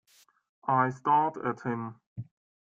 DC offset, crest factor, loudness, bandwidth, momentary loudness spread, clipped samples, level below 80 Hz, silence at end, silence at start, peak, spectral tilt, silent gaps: under 0.1%; 20 dB; -29 LUFS; 7.8 kHz; 20 LU; under 0.1%; -72 dBFS; 0.4 s; 0.65 s; -12 dBFS; -8 dB/octave; 2.06-2.16 s